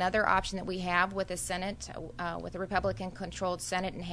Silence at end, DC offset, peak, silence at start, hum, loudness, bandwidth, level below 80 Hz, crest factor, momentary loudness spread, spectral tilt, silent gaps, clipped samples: 0 s; under 0.1%; -10 dBFS; 0 s; none; -33 LUFS; 11 kHz; -50 dBFS; 22 dB; 10 LU; -4 dB/octave; none; under 0.1%